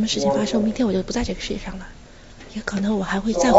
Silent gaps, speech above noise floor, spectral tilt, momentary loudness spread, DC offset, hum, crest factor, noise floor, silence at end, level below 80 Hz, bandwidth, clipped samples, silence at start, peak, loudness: none; 22 dB; -5 dB/octave; 16 LU; 0.1%; none; 20 dB; -43 dBFS; 0 s; -38 dBFS; 8 kHz; under 0.1%; 0 s; 0 dBFS; -23 LUFS